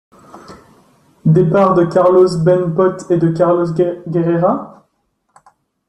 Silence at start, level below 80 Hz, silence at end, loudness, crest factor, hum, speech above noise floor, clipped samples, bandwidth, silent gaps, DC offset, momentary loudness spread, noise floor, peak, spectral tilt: 0.35 s; -52 dBFS; 1.2 s; -13 LUFS; 14 dB; none; 53 dB; under 0.1%; 10.5 kHz; none; under 0.1%; 6 LU; -65 dBFS; -2 dBFS; -9 dB/octave